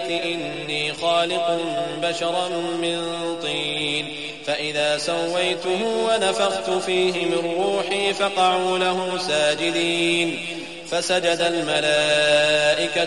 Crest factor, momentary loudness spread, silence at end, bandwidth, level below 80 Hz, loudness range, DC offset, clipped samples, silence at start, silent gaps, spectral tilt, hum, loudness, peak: 14 dB; 7 LU; 0 s; 11.5 kHz; -60 dBFS; 4 LU; 0.3%; under 0.1%; 0 s; none; -3 dB/octave; none; -21 LUFS; -6 dBFS